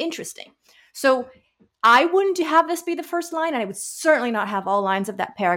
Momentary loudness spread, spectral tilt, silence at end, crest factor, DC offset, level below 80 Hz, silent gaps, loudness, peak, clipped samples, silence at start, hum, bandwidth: 14 LU; -3.5 dB/octave; 0 s; 16 dB; under 0.1%; -70 dBFS; none; -21 LUFS; -4 dBFS; under 0.1%; 0 s; none; 17 kHz